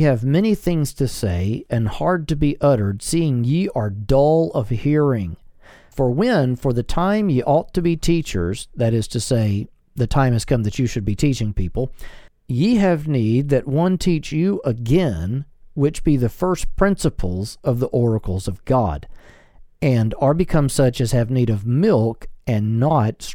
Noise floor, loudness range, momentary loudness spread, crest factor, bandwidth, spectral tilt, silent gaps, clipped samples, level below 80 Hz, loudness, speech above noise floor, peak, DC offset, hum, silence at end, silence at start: -45 dBFS; 2 LU; 8 LU; 18 dB; 17.5 kHz; -7 dB/octave; none; under 0.1%; -34 dBFS; -20 LUFS; 27 dB; -2 dBFS; under 0.1%; none; 0 s; 0 s